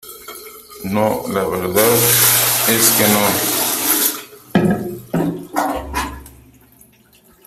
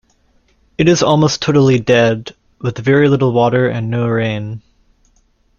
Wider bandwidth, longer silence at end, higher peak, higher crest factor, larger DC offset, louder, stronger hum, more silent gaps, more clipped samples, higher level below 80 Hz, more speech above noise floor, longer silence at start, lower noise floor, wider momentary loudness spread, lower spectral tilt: first, 16 kHz vs 7.2 kHz; first, 1.15 s vs 1 s; about the same, 0 dBFS vs 0 dBFS; about the same, 18 dB vs 14 dB; neither; about the same, -15 LUFS vs -14 LUFS; neither; neither; neither; about the same, -42 dBFS vs -46 dBFS; second, 36 dB vs 43 dB; second, 0.05 s vs 0.8 s; second, -50 dBFS vs -56 dBFS; first, 18 LU vs 13 LU; second, -3 dB/octave vs -6 dB/octave